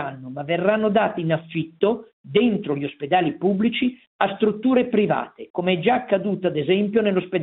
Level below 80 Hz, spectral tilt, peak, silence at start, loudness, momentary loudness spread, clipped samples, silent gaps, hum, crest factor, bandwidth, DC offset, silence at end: -62 dBFS; -11 dB/octave; -2 dBFS; 0 s; -22 LUFS; 7 LU; under 0.1%; 2.13-2.24 s, 4.07-4.19 s, 5.50-5.54 s; none; 20 dB; 4.1 kHz; under 0.1%; 0 s